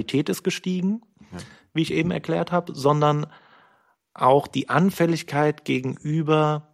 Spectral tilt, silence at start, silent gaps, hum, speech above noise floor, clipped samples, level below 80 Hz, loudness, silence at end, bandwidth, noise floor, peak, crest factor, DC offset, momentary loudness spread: -6.5 dB/octave; 0 s; none; none; 40 dB; under 0.1%; -60 dBFS; -23 LUFS; 0.1 s; 15.5 kHz; -62 dBFS; -4 dBFS; 20 dB; under 0.1%; 12 LU